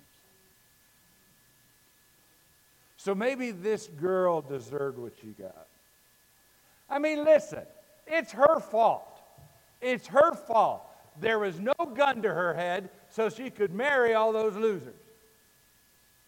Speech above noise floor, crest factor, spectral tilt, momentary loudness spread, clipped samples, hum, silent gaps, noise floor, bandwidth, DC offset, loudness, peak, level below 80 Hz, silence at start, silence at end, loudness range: 36 dB; 22 dB; -5 dB/octave; 16 LU; under 0.1%; none; none; -63 dBFS; 17 kHz; under 0.1%; -28 LUFS; -8 dBFS; -74 dBFS; 3 s; 1.35 s; 7 LU